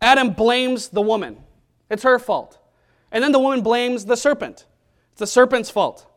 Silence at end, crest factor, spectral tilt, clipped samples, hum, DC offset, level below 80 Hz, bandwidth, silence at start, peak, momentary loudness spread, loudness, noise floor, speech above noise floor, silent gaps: 0.25 s; 18 dB; -3.5 dB/octave; under 0.1%; none; under 0.1%; -54 dBFS; 15 kHz; 0 s; 0 dBFS; 11 LU; -19 LUFS; -60 dBFS; 42 dB; none